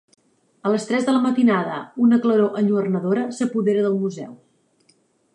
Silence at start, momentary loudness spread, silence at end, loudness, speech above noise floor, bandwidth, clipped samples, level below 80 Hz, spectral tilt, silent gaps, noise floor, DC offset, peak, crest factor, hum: 0.65 s; 11 LU; 1 s; -20 LUFS; 42 dB; 10 kHz; under 0.1%; -74 dBFS; -7 dB/octave; none; -61 dBFS; under 0.1%; -8 dBFS; 14 dB; none